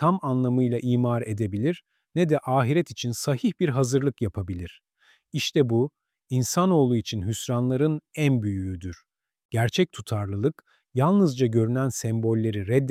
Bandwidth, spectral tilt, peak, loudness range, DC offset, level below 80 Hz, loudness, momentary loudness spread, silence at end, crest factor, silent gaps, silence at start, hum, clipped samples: 15.5 kHz; -6.5 dB/octave; -8 dBFS; 2 LU; under 0.1%; -58 dBFS; -25 LUFS; 9 LU; 0 s; 16 dB; 9.45-9.49 s; 0 s; none; under 0.1%